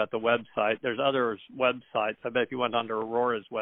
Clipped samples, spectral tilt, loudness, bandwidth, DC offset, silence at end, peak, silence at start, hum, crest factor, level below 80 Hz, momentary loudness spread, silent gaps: under 0.1%; -2 dB/octave; -28 LUFS; 4 kHz; under 0.1%; 0 s; -10 dBFS; 0 s; none; 18 dB; -70 dBFS; 4 LU; none